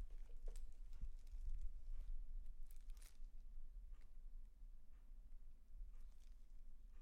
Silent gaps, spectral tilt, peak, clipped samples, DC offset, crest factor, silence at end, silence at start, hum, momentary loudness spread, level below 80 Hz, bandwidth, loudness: none; -5.5 dB/octave; -36 dBFS; under 0.1%; under 0.1%; 14 dB; 0 s; 0 s; none; 10 LU; -52 dBFS; 10.5 kHz; -62 LUFS